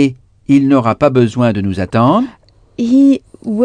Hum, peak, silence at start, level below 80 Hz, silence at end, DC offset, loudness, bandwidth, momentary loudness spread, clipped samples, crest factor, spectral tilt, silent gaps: none; 0 dBFS; 0 s; -46 dBFS; 0 s; under 0.1%; -13 LUFS; 9.4 kHz; 11 LU; under 0.1%; 12 dB; -8 dB/octave; none